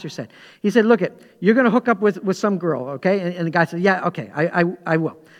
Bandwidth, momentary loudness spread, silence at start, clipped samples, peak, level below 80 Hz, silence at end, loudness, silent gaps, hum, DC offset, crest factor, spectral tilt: 12.5 kHz; 9 LU; 0 s; under 0.1%; -2 dBFS; -70 dBFS; 0.25 s; -19 LUFS; none; none; under 0.1%; 18 dB; -7 dB/octave